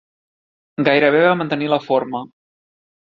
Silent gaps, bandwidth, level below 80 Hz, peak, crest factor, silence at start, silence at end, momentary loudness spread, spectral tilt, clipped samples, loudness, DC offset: none; 6.2 kHz; -64 dBFS; -2 dBFS; 18 dB; 0.8 s; 0.85 s; 14 LU; -7.5 dB/octave; under 0.1%; -17 LUFS; under 0.1%